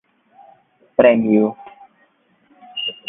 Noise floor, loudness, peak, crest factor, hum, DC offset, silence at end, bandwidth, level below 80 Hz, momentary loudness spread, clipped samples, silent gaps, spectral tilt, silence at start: -59 dBFS; -16 LUFS; 0 dBFS; 20 dB; none; under 0.1%; 0.15 s; 3.8 kHz; -62 dBFS; 17 LU; under 0.1%; none; -10 dB/octave; 1 s